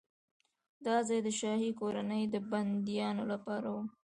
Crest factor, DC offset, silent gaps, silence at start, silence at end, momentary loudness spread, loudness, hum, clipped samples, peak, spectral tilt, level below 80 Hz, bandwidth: 16 dB; under 0.1%; none; 0.8 s; 0.15 s; 5 LU; -35 LUFS; none; under 0.1%; -18 dBFS; -5 dB/octave; -78 dBFS; 10.5 kHz